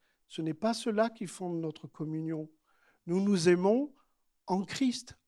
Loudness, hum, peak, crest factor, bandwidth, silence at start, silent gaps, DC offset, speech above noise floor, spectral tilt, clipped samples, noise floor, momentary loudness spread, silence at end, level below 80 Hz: -32 LUFS; none; -14 dBFS; 20 dB; 12.5 kHz; 0.3 s; none; under 0.1%; 39 dB; -6 dB/octave; under 0.1%; -70 dBFS; 15 LU; 0.15 s; -74 dBFS